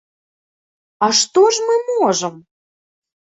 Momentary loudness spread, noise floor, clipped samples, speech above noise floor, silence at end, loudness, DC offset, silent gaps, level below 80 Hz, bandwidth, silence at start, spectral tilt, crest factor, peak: 8 LU; under -90 dBFS; under 0.1%; over 75 dB; 0.85 s; -15 LUFS; under 0.1%; none; -68 dBFS; 8.4 kHz; 1 s; -2.5 dB/octave; 18 dB; -2 dBFS